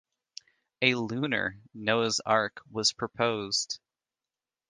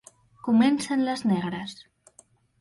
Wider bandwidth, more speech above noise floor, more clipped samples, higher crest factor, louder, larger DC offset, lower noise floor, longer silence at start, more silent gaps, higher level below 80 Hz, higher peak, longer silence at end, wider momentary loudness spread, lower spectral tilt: about the same, 10.5 kHz vs 11.5 kHz; first, over 61 dB vs 35 dB; neither; first, 24 dB vs 16 dB; second, -28 LUFS vs -25 LUFS; neither; first, under -90 dBFS vs -59 dBFS; first, 0.8 s vs 0.45 s; neither; about the same, -68 dBFS vs -66 dBFS; about the same, -8 dBFS vs -10 dBFS; about the same, 0.95 s vs 0.85 s; about the same, 17 LU vs 15 LU; second, -3 dB/octave vs -5.5 dB/octave